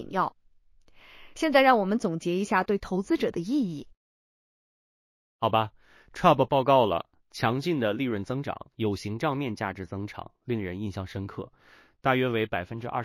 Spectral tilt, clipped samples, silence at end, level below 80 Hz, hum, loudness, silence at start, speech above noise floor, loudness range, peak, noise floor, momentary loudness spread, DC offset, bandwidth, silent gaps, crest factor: -6.5 dB/octave; under 0.1%; 0 s; -58 dBFS; none; -27 LUFS; 0 s; 32 dB; 6 LU; -6 dBFS; -58 dBFS; 15 LU; under 0.1%; 16 kHz; 3.97-5.39 s; 22 dB